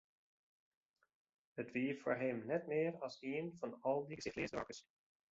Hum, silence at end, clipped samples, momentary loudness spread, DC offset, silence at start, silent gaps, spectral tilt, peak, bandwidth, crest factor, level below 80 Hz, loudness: none; 0.5 s; under 0.1%; 9 LU; under 0.1%; 1.55 s; none; -5 dB/octave; -24 dBFS; 7.6 kHz; 20 dB; -76 dBFS; -42 LUFS